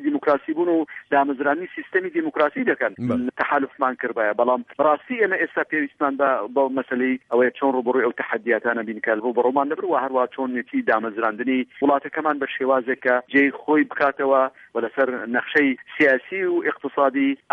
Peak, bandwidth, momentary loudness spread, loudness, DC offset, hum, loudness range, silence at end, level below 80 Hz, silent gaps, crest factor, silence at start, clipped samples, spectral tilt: -6 dBFS; 5.6 kHz; 5 LU; -22 LUFS; under 0.1%; none; 2 LU; 0.2 s; -70 dBFS; none; 16 dB; 0 s; under 0.1%; -7.5 dB/octave